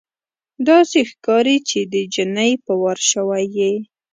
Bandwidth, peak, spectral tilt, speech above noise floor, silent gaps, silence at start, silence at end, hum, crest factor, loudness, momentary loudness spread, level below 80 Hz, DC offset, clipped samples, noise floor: 9.6 kHz; 0 dBFS; -3 dB/octave; over 73 dB; none; 0.6 s; 0.3 s; none; 16 dB; -17 LUFS; 7 LU; -68 dBFS; under 0.1%; under 0.1%; under -90 dBFS